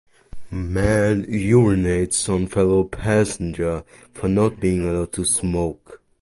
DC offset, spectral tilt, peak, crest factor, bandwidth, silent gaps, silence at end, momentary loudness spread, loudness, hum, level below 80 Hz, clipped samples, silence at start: under 0.1%; -5.5 dB/octave; -4 dBFS; 16 dB; 11.5 kHz; none; 0.25 s; 10 LU; -20 LUFS; none; -36 dBFS; under 0.1%; 0.35 s